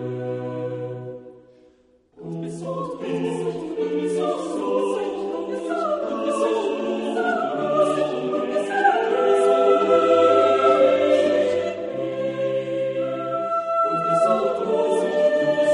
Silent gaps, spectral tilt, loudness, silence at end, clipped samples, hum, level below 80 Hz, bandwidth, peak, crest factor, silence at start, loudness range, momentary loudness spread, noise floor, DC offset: none; -5.5 dB/octave; -21 LUFS; 0 s; under 0.1%; none; -66 dBFS; 10.5 kHz; -6 dBFS; 16 dB; 0 s; 10 LU; 12 LU; -58 dBFS; under 0.1%